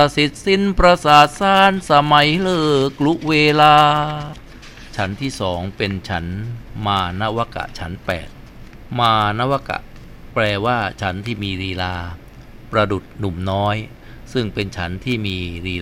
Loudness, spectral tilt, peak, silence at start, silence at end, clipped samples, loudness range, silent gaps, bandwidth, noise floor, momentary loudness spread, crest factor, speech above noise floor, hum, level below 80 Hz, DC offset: -17 LUFS; -5.5 dB/octave; 0 dBFS; 0 s; 0 s; under 0.1%; 9 LU; none; 16.5 kHz; -38 dBFS; 16 LU; 18 dB; 21 dB; none; -36 dBFS; under 0.1%